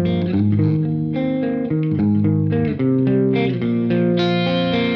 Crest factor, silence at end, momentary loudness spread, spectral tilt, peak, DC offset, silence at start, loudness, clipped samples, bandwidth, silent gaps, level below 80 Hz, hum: 10 dB; 0 s; 4 LU; -9.5 dB/octave; -6 dBFS; under 0.1%; 0 s; -18 LUFS; under 0.1%; 6.2 kHz; none; -48 dBFS; none